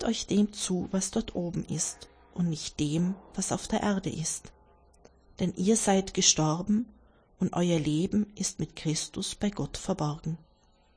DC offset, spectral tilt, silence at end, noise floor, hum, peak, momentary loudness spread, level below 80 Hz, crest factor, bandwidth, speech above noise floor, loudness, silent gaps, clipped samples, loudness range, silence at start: under 0.1%; -4.5 dB/octave; 0.6 s; -63 dBFS; none; -8 dBFS; 9 LU; -52 dBFS; 22 dB; 10.5 kHz; 34 dB; -29 LUFS; none; under 0.1%; 5 LU; 0 s